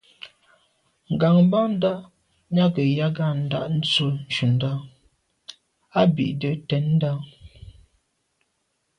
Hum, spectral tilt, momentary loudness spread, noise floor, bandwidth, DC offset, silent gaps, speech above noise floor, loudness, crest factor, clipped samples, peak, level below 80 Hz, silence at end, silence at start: none; -7.5 dB/octave; 24 LU; -73 dBFS; 9.8 kHz; under 0.1%; none; 52 dB; -22 LUFS; 18 dB; under 0.1%; -6 dBFS; -58 dBFS; 1.3 s; 0.25 s